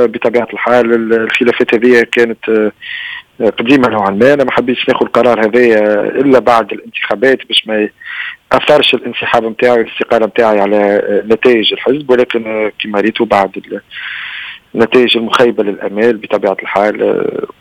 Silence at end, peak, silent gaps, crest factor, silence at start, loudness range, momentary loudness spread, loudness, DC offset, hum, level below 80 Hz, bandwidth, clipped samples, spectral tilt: 0.15 s; 0 dBFS; none; 12 dB; 0 s; 3 LU; 11 LU; -11 LUFS; under 0.1%; none; -50 dBFS; 12.5 kHz; 0.9%; -5.5 dB/octave